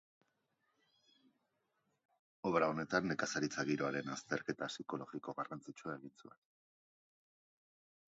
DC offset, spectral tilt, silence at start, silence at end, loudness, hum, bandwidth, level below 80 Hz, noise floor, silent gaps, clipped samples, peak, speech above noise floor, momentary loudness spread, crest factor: under 0.1%; -4 dB/octave; 2.45 s; 1.8 s; -40 LUFS; none; 7.6 kHz; -78 dBFS; -84 dBFS; none; under 0.1%; -18 dBFS; 43 dB; 12 LU; 24 dB